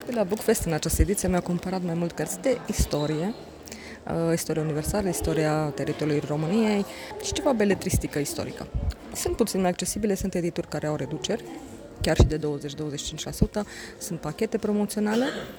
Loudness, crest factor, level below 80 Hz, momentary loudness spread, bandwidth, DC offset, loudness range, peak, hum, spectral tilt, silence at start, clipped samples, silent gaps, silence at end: -27 LUFS; 22 dB; -36 dBFS; 9 LU; over 20 kHz; under 0.1%; 2 LU; -4 dBFS; none; -5 dB/octave; 0 s; under 0.1%; none; 0 s